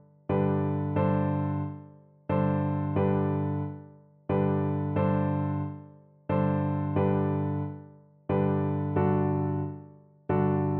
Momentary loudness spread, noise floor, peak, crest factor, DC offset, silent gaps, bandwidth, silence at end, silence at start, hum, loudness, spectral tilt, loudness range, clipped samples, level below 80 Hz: 13 LU; -51 dBFS; -14 dBFS; 14 dB; under 0.1%; none; 3.8 kHz; 0 s; 0.3 s; 50 Hz at -55 dBFS; -28 LUFS; -13 dB/octave; 2 LU; under 0.1%; -60 dBFS